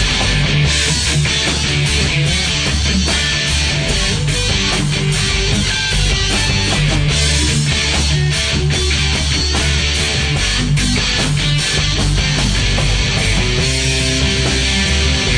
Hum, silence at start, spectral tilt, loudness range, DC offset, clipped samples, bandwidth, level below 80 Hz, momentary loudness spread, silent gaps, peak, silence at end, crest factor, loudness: none; 0 s; -3.5 dB/octave; 1 LU; under 0.1%; under 0.1%; 10 kHz; -20 dBFS; 1 LU; none; -2 dBFS; 0 s; 12 dB; -14 LUFS